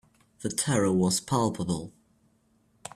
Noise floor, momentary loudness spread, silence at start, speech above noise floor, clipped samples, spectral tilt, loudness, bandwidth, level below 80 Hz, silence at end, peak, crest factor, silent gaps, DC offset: -67 dBFS; 15 LU; 0.4 s; 40 dB; under 0.1%; -5 dB/octave; -27 LUFS; 15 kHz; -60 dBFS; 0.05 s; -10 dBFS; 18 dB; none; under 0.1%